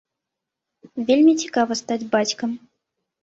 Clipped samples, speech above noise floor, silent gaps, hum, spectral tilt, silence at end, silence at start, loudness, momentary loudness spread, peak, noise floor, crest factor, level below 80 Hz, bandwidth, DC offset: under 0.1%; 64 dB; none; none; -3.5 dB/octave; 0.65 s; 0.95 s; -20 LUFS; 14 LU; -6 dBFS; -84 dBFS; 16 dB; -68 dBFS; 8 kHz; under 0.1%